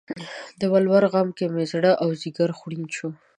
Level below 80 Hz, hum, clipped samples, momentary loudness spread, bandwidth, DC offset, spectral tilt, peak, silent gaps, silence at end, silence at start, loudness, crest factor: -70 dBFS; none; under 0.1%; 14 LU; 10.5 kHz; under 0.1%; -6.5 dB/octave; -4 dBFS; none; 0.25 s; 0.1 s; -22 LUFS; 18 dB